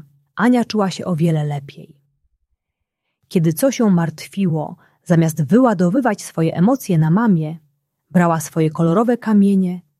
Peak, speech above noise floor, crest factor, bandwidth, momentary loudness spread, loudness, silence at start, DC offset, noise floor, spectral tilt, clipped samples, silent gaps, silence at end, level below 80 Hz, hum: -2 dBFS; 62 dB; 16 dB; 14.5 kHz; 8 LU; -17 LUFS; 0.35 s; under 0.1%; -78 dBFS; -7 dB/octave; under 0.1%; none; 0.2 s; -60 dBFS; none